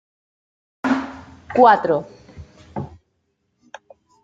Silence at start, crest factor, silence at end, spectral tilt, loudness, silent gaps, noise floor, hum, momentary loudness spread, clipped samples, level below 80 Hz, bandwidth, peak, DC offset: 0.85 s; 22 dB; 1.35 s; -6.5 dB/octave; -18 LUFS; none; -70 dBFS; none; 24 LU; under 0.1%; -56 dBFS; 7.8 kHz; 0 dBFS; under 0.1%